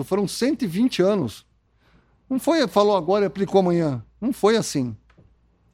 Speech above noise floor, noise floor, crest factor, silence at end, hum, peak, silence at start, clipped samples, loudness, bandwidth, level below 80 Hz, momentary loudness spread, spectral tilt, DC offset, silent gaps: 39 dB; -60 dBFS; 18 dB; 0.75 s; none; -4 dBFS; 0 s; under 0.1%; -22 LUFS; 16 kHz; -56 dBFS; 9 LU; -5.5 dB/octave; under 0.1%; none